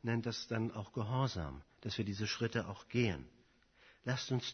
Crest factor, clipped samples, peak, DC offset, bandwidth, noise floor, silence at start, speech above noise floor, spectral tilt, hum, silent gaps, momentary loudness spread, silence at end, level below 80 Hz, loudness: 18 dB; under 0.1%; -20 dBFS; under 0.1%; 6.4 kHz; -68 dBFS; 0 s; 30 dB; -5 dB/octave; none; none; 9 LU; 0 s; -60 dBFS; -39 LUFS